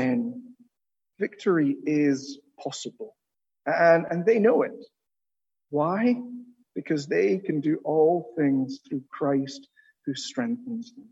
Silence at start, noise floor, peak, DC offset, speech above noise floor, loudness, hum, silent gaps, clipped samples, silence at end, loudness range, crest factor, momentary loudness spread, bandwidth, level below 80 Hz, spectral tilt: 0 s; under -90 dBFS; -8 dBFS; under 0.1%; over 65 dB; -25 LUFS; none; none; under 0.1%; 0.1 s; 4 LU; 18 dB; 17 LU; 8 kHz; -78 dBFS; -6 dB/octave